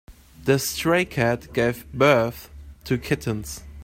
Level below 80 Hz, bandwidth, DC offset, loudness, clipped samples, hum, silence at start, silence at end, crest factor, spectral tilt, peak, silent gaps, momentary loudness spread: -46 dBFS; 16 kHz; under 0.1%; -23 LUFS; under 0.1%; none; 0.1 s; 0 s; 20 dB; -5 dB/octave; -4 dBFS; none; 13 LU